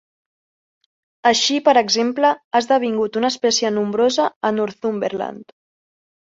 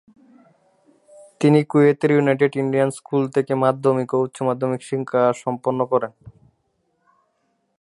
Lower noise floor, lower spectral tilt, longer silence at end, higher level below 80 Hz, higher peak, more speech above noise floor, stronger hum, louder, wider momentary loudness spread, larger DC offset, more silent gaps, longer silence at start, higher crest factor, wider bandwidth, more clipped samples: first, under -90 dBFS vs -69 dBFS; second, -3 dB/octave vs -7.5 dB/octave; second, 0.95 s vs 1.5 s; about the same, -66 dBFS vs -66 dBFS; about the same, -2 dBFS vs -2 dBFS; first, over 72 dB vs 50 dB; neither; about the same, -18 LUFS vs -20 LUFS; about the same, 8 LU vs 8 LU; neither; first, 2.44-2.51 s, 4.36-4.41 s vs none; second, 1.25 s vs 1.4 s; about the same, 18 dB vs 18 dB; second, 8 kHz vs 11.5 kHz; neither